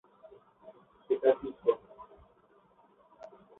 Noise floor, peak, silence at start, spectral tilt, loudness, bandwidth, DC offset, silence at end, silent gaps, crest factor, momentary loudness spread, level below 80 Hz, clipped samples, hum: -65 dBFS; -12 dBFS; 0.65 s; -4 dB/octave; -31 LUFS; 4 kHz; under 0.1%; 1.55 s; none; 24 dB; 26 LU; -72 dBFS; under 0.1%; none